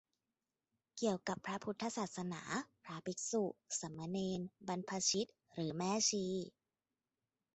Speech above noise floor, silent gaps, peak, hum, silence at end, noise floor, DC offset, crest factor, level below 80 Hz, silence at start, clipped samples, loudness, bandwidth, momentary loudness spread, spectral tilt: over 50 dB; none; -22 dBFS; none; 1.05 s; under -90 dBFS; under 0.1%; 20 dB; -78 dBFS; 0.95 s; under 0.1%; -40 LUFS; 8.4 kHz; 10 LU; -3.5 dB/octave